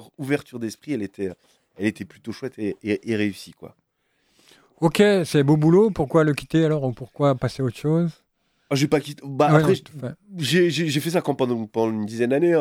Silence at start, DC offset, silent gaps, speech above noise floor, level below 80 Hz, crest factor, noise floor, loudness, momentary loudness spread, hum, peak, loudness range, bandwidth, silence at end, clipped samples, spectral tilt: 0 s; under 0.1%; none; 48 dB; -56 dBFS; 18 dB; -69 dBFS; -22 LUFS; 15 LU; none; -4 dBFS; 9 LU; 16 kHz; 0 s; under 0.1%; -6.5 dB/octave